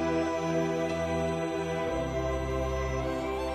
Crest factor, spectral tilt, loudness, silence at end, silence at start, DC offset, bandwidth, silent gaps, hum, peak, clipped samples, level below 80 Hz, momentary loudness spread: 12 dB; -6 dB/octave; -31 LUFS; 0 s; 0 s; under 0.1%; 14 kHz; none; none; -18 dBFS; under 0.1%; -40 dBFS; 2 LU